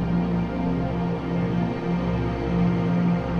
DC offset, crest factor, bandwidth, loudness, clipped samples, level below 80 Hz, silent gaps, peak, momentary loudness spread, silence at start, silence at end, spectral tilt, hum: under 0.1%; 12 dB; 6.2 kHz; -24 LUFS; under 0.1%; -36 dBFS; none; -12 dBFS; 4 LU; 0 s; 0 s; -9.5 dB/octave; none